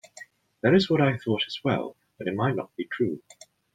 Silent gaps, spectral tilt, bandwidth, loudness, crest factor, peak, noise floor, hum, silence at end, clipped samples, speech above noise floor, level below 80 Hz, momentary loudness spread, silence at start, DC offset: none; -6.5 dB/octave; 9.4 kHz; -26 LUFS; 20 dB; -8 dBFS; -50 dBFS; none; 0.55 s; under 0.1%; 25 dB; -64 dBFS; 18 LU; 0.2 s; under 0.1%